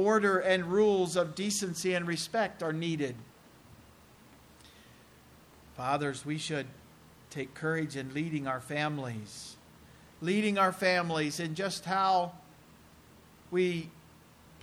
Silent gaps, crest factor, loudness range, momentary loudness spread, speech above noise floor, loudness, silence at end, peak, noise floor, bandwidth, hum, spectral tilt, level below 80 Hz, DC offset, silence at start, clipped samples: none; 18 dB; 8 LU; 15 LU; 27 dB; -31 LUFS; 0.05 s; -14 dBFS; -57 dBFS; over 20 kHz; none; -4.5 dB/octave; -68 dBFS; under 0.1%; 0 s; under 0.1%